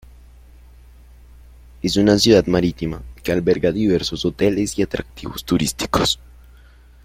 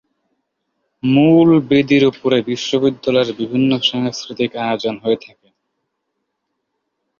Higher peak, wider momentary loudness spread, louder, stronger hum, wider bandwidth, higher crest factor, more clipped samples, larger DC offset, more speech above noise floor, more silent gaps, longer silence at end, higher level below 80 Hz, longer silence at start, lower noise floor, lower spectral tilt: about the same, -2 dBFS vs -2 dBFS; first, 14 LU vs 10 LU; second, -19 LUFS vs -16 LUFS; first, 60 Hz at -40 dBFS vs none; first, 16.5 kHz vs 7.2 kHz; about the same, 18 dB vs 16 dB; neither; neither; second, 28 dB vs 59 dB; neither; second, 0.9 s vs 2.05 s; first, -40 dBFS vs -56 dBFS; first, 1.85 s vs 1.05 s; second, -46 dBFS vs -74 dBFS; about the same, -5 dB/octave vs -6 dB/octave